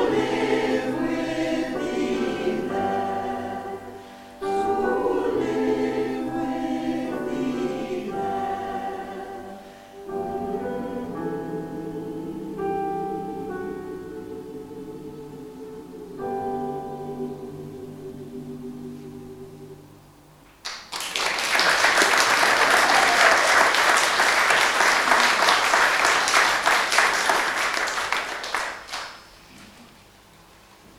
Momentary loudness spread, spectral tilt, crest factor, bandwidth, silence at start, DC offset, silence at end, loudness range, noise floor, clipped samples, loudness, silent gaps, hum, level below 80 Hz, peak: 21 LU; -2 dB/octave; 24 dB; 17 kHz; 0 s; under 0.1%; 1.1 s; 17 LU; -51 dBFS; under 0.1%; -22 LUFS; none; none; -54 dBFS; -2 dBFS